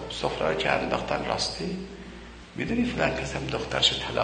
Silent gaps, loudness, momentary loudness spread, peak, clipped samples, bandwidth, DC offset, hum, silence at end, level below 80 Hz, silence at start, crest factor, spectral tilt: none; -27 LUFS; 18 LU; -6 dBFS; under 0.1%; 9.6 kHz; under 0.1%; none; 0 s; -44 dBFS; 0 s; 22 dB; -4 dB/octave